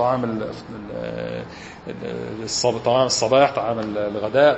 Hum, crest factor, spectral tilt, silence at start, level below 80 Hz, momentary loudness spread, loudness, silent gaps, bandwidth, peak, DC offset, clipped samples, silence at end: none; 18 dB; -4 dB/octave; 0 s; -52 dBFS; 16 LU; -22 LUFS; none; 8.6 kHz; -2 dBFS; under 0.1%; under 0.1%; 0 s